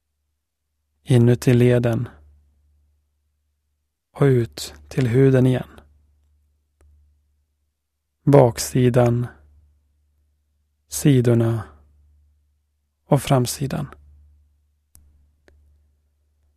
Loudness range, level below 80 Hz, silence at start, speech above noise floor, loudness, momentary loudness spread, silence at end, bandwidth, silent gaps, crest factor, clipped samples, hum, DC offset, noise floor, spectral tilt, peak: 5 LU; -50 dBFS; 1.1 s; 60 dB; -19 LUFS; 15 LU; 2.7 s; 14 kHz; none; 22 dB; under 0.1%; none; under 0.1%; -77 dBFS; -7 dB/octave; 0 dBFS